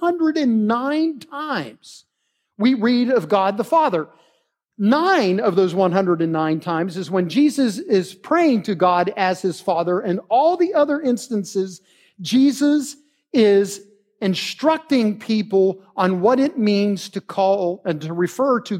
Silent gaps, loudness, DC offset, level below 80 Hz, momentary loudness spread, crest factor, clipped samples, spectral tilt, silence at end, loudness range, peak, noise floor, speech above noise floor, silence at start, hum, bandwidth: none; -19 LUFS; under 0.1%; -76 dBFS; 9 LU; 16 dB; under 0.1%; -6 dB/octave; 0 s; 2 LU; -4 dBFS; -73 dBFS; 54 dB; 0 s; none; 16 kHz